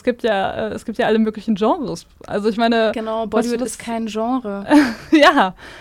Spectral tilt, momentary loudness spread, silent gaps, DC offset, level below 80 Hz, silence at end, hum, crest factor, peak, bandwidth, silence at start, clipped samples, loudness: -4.5 dB/octave; 12 LU; none; under 0.1%; -50 dBFS; 0 s; none; 14 dB; -2 dBFS; 15 kHz; 0.05 s; under 0.1%; -18 LUFS